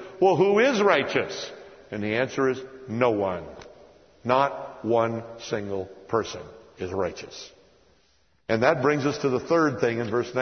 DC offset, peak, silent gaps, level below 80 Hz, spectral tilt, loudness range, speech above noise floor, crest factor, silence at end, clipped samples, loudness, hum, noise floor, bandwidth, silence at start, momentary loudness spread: under 0.1%; -4 dBFS; none; -62 dBFS; -5.5 dB/octave; 6 LU; 41 dB; 22 dB; 0 s; under 0.1%; -25 LUFS; none; -65 dBFS; 6.6 kHz; 0 s; 18 LU